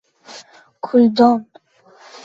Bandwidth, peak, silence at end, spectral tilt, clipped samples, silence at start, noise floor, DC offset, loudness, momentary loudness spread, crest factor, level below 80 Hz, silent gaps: 7.6 kHz; -2 dBFS; 0.85 s; -6.5 dB/octave; under 0.1%; 0.3 s; -49 dBFS; under 0.1%; -15 LUFS; 26 LU; 16 dB; -64 dBFS; none